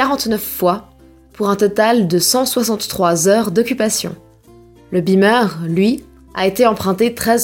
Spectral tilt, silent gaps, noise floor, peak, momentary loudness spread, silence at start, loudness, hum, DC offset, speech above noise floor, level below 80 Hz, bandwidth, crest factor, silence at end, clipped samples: -4 dB/octave; none; -44 dBFS; -2 dBFS; 7 LU; 0 s; -15 LUFS; none; under 0.1%; 29 dB; -48 dBFS; 17 kHz; 14 dB; 0 s; under 0.1%